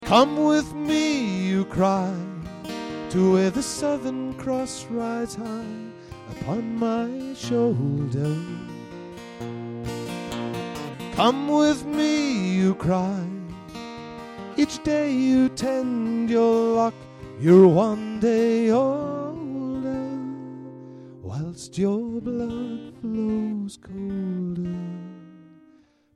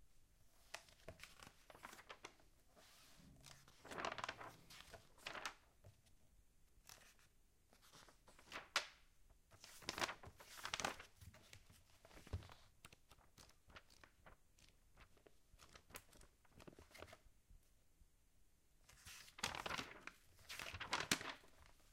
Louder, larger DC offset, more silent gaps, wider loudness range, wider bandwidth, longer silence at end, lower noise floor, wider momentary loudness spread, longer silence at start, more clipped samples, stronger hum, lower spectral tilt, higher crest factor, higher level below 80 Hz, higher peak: first, -24 LUFS vs -50 LUFS; neither; neither; second, 10 LU vs 16 LU; second, 13.5 kHz vs 16 kHz; first, 0.75 s vs 0 s; second, -57 dBFS vs -74 dBFS; second, 17 LU vs 23 LU; about the same, 0 s vs 0 s; neither; neither; first, -6 dB/octave vs -2 dB/octave; second, 20 dB vs 36 dB; first, -52 dBFS vs -70 dBFS; first, -4 dBFS vs -18 dBFS